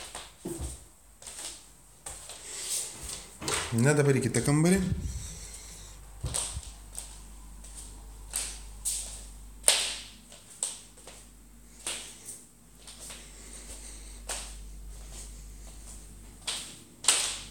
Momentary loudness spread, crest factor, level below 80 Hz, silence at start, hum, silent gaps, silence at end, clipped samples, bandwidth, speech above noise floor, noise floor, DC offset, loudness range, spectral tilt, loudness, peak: 23 LU; 32 dB; -48 dBFS; 0 s; none; none; 0 s; under 0.1%; 17 kHz; 29 dB; -54 dBFS; under 0.1%; 14 LU; -3.5 dB/octave; -30 LUFS; -2 dBFS